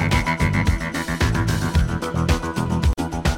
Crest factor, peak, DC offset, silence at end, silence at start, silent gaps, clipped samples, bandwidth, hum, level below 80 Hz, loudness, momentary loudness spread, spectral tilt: 16 dB; -4 dBFS; under 0.1%; 0 s; 0 s; none; under 0.1%; 16.5 kHz; none; -26 dBFS; -21 LUFS; 4 LU; -5.5 dB/octave